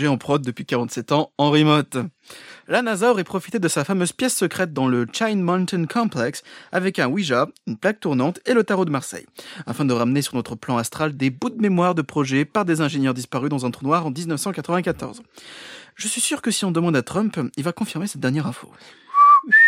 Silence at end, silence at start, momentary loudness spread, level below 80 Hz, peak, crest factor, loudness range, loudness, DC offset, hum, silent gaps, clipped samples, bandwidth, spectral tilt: 0 s; 0 s; 11 LU; -62 dBFS; -2 dBFS; 18 dB; 3 LU; -21 LUFS; under 0.1%; none; none; under 0.1%; 16 kHz; -5 dB/octave